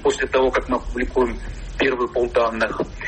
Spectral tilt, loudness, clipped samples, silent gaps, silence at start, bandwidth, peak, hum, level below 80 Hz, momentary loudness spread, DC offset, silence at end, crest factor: -5 dB/octave; -21 LUFS; under 0.1%; none; 0 s; 8.8 kHz; -8 dBFS; none; -34 dBFS; 5 LU; under 0.1%; 0 s; 14 dB